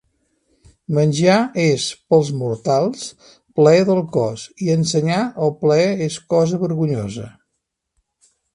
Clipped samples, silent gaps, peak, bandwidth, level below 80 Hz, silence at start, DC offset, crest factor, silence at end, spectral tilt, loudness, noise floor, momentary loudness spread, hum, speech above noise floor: under 0.1%; none; 0 dBFS; 11 kHz; -56 dBFS; 0.9 s; under 0.1%; 18 dB; 1.25 s; -6 dB/octave; -18 LUFS; -76 dBFS; 10 LU; none; 59 dB